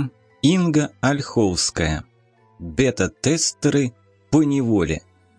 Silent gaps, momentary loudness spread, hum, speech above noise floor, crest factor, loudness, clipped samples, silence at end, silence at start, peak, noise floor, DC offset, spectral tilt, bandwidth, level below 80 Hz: none; 10 LU; none; 37 dB; 16 dB; -20 LUFS; under 0.1%; 0.4 s; 0 s; -4 dBFS; -57 dBFS; under 0.1%; -5 dB/octave; 10.5 kHz; -42 dBFS